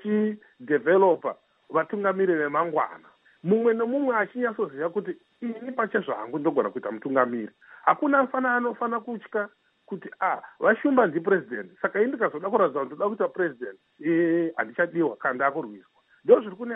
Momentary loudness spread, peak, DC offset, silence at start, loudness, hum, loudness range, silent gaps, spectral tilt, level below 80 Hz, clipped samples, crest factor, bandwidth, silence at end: 14 LU; -4 dBFS; under 0.1%; 0.05 s; -25 LUFS; none; 3 LU; none; -10.5 dB/octave; -82 dBFS; under 0.1%; 20 dB; 3.9 kHz; 0 s